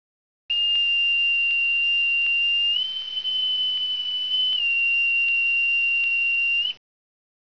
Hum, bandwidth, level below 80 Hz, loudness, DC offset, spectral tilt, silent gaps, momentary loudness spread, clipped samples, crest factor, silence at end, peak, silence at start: none; 5.4 kHz; -72 dBFS; -19 LUFS; 0.3%; 1.5 dB/octave; none; 5 LU; under 0.1%; 8 dB; 0.8 s; -14 dBFS; 0.5 s